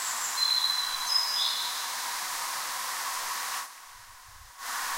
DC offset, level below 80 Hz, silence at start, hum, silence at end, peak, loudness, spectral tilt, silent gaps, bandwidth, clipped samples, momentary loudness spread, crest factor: under 0.1%; -66 dBFS; 0 s; none; 0 s; -14 dBFS; -28 LUFS; 3 dB/octave; none; 16 kHz; under 0.1%; 22 LU; 18 dB